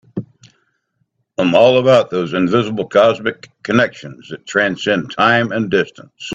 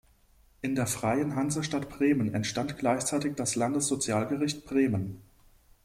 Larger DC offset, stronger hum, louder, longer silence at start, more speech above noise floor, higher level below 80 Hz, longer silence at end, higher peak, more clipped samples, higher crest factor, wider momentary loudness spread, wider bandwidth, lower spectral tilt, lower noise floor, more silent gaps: neither; neither; first, -15 LUFS vs -29 LUFS; second, 0.15 s vs 0.65 s; first, 52 dB vs 33 dB; about the same, -56 dBFS vs -58 dBFS; second, 0 s vs 0.65 s; first, 0 dBFS vs -14 dBFS; neither; about the same, 16 dB vs 16 dB; first, 18 LU vs 6 LU; second, 8 kHz vs 15.5 kHz; about the same, -5.5 dB/octave vs -4.5 dB/octave; first, -67 dBFS vs -62 dBFS; neither